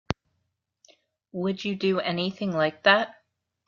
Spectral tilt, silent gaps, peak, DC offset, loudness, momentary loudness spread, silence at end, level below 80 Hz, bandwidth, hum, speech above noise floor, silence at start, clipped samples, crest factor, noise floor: -6 dB/octave; none; -4 dBFS; under 0.1%; -25 LUFS; 15 LU; 0.55 s; -60 dBFS; 7.2 kHz; none; 53 dB; 0.1 s; under 0.1%; 24 dB; -78 dBFS